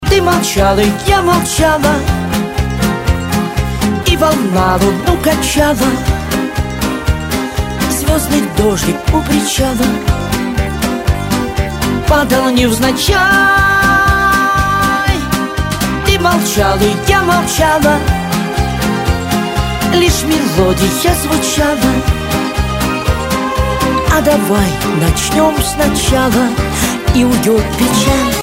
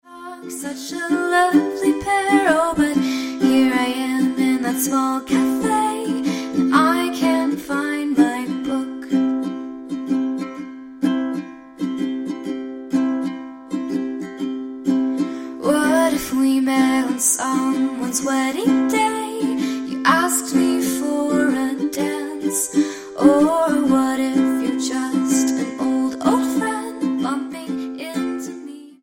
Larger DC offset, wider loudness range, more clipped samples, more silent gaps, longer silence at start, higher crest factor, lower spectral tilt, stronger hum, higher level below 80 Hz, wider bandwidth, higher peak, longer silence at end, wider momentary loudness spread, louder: neither; about the same, 4 LU vs 6 LU; neither; neither; about the same, 0 s vs 0.05 s; second, 12 dB vs 18 dB; about the same, -4.5 dB/octave vs -3.5 dB/octave; neither; first, -22 dBFS vs -56 dBFS; about the same, 16.5 kHz vs 16.5 kHz; about the same, 0 dBFS vs 0 dBFS; about the same, 0 s vs 0.1 s; second, 6 LU vs 11 LU; first, -12 LUFS vs -20 LUFS